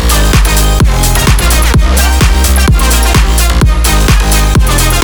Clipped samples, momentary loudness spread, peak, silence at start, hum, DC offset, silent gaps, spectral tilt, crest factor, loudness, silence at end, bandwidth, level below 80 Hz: 0.2%; 1 LU; 0 dBFS; 0 s; none; under 0.1%; none; -4 dB/octave; 6 dB; -8 LUFS; 0 s; over 20 kHz; -8 dBFS